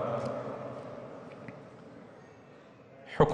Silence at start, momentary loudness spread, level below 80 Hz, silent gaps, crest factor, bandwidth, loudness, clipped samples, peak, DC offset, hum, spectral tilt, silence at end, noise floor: 0 s; 19 LU; -56 dBFS; none; 24 dB; 9.6 kHz; -38 LUFS; under 0.1%; -10 dBFS; under 0.1%; none; -7.5 dB/octave; 0 s; -54 dBFS